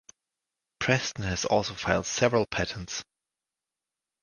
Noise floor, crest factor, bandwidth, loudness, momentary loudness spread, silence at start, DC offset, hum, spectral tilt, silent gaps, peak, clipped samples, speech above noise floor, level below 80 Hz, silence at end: -89 dBFS; 24 dB; 11 kHz; -28 LUFS; 9 LU; 0.8 s; under 0.1%; none; -4 dB/octave; none; -6 dBFS; under 0.1%; 62 dB; -50 dBFS; 1.2 s